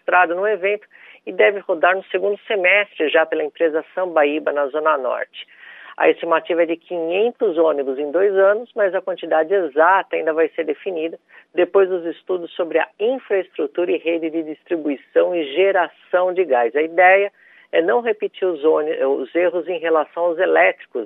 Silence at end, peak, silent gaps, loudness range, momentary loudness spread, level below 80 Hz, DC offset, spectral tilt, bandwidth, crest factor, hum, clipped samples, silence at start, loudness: 0 s; -2 dBFS; none; 3 LU; 10 LU; -84 dBFS; under 0.1%; -7.5 dB/octave; 3.9 kHz; 18 dB; none; under 0.1%; 0.1 s; -19 LUFS